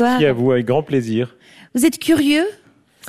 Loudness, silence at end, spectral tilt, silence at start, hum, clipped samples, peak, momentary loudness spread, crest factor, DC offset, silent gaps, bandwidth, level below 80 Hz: -17 LUFS; 0 s; -5.5 dB/octave; 0 s; none; under 0.1%; -4 dBFS; 9 LU; 14 dB; under 0.1%; none; 15 kHz; -54 dBFS